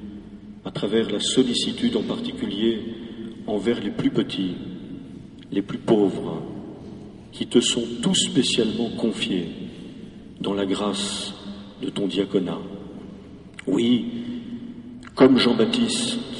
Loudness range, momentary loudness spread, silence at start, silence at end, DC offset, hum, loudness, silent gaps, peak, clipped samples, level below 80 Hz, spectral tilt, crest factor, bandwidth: 5 LU; 20 LU; 0 s; 0 s; under 0.1%; none; -23 LUFS; none; -4 dBFS; under 0.1%; -54 dBFS; -4.5 dB/octave; 20 dB; 11 kHz